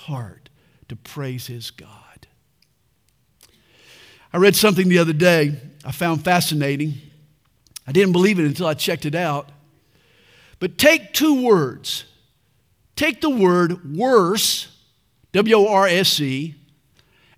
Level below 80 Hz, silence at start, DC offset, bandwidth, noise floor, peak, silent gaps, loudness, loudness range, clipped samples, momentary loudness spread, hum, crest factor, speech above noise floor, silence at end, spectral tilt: -60 dBFS; 0.05 s; under 0.1%; 16.5 kHz; -64 dBFS; 0 dBFS; none; -18 LUFS; 14 LU; under 0.1%; 18 LU; none; 20 dB; 46 dB; 0.85 s; -4.5 dB/octave